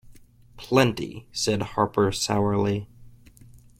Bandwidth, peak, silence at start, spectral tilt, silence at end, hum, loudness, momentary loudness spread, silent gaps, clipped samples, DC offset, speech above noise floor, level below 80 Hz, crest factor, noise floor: 16 kHz; -4 dBFS; 0.05 s; -5 dB/octave; 0.7 s; none; -24 LUFS; 11 LU; none; under 0.1%; under 0.1%; 27 dB; -50 dBFS; 22 dB; -50 dBFS